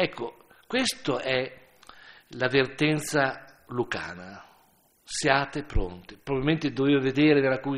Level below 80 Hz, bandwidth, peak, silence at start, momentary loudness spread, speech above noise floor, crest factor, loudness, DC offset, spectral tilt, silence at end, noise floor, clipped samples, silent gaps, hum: -42 dBFS; 14 kHz; -4 dBFS; 0 s; 16 LU; 37 dB; 24 dB; -26 LUFS; under 0.1%; -5 dB/octave; 0 s; -63 dBFS; under 0.1%; none; none